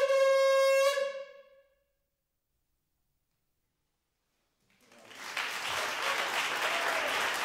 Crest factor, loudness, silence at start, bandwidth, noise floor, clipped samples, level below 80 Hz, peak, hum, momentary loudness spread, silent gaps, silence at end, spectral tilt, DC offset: 16 dB; -29 LUFS; 0 s; 16 kHz; -83 dBFS; under 0.1%; -78 dBFS; -16 dBFS; none; 13 LU; none; 0 s; 0 dB/octave; under 0.1%